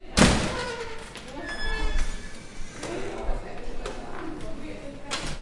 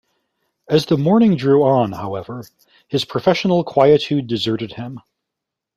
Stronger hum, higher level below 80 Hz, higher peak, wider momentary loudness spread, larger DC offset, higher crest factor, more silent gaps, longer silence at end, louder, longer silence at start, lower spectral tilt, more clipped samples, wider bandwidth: neither; first, -32 dBFS vs -56 dBFS; about the same, -2 dBFS vs -2 dBFS; about the same, 16 LU vs 15 LU; neither; first, 24 dB vs 16 dB; neither; second, 0 s vs 0.8 s; second, -30 LUFS vs -17 LUFS; second, 0 s vs 0.7 s; second, -4 dB/octave vs -7 dB/octave; neither; second, 11.5 kHz vs 14 kHz